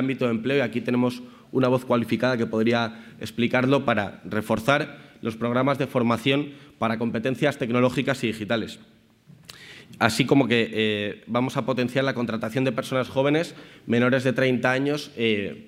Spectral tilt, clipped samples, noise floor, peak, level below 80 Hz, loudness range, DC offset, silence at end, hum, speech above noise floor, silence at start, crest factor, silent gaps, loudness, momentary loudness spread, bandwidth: -6 dB/octave; under 0.1%; -53 dBFS; 0 dBFS; -64 dBFS; 2 LU; under 0.1%; 0.05 s; none; 29 dB; 0 s; 24 dB; none; -24 LUFS; 10 LU; 15.5 kHz